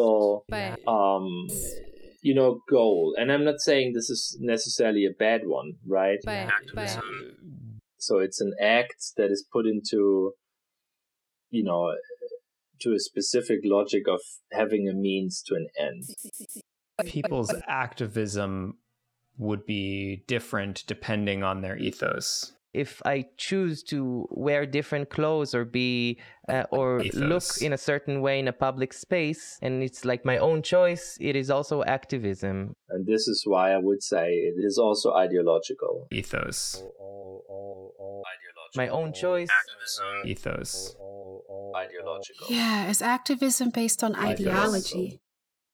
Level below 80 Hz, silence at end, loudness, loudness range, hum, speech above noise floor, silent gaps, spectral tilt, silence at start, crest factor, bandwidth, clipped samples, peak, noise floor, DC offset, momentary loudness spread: -58 dBFS; 0.55 s; -27 LUFS; 7 LU; none; 58 dB; none; -4 dB/octave; 0 s; 18 dB; 19.5 kHz; under 0.1%; -10 dBFS; -85 dBFS; under 0.1%; 15 LU